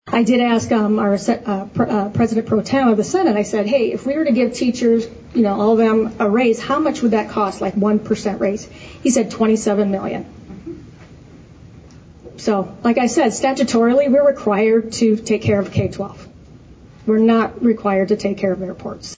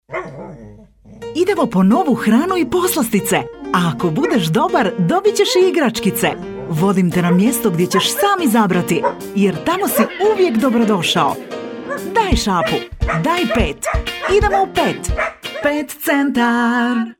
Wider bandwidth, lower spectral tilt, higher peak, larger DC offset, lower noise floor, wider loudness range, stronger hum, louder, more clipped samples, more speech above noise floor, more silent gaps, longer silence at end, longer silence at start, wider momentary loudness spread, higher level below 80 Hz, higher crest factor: second, 8 kHz vs 18 kHz; about the same, -6 dB/octave vs -5 dB/octave; second, -6 dBFS vs -2 dBFS; neither; about the same, -42 dBFS vs -41 dBFS; first, 5 LU vs 2 LU; neither; about the same, -17 LUFS vs -16 LUFS; neither; about the same, 25 dB vs 26 dB; neither; about the same, 0.05 s vs 0.05 s; about the same, 0.05 s vs 0.1 s; first, 10 LU vs 7 LU; second, -48 dBFS vs -32 dBFS; about the same, 12 dB vs 14 dB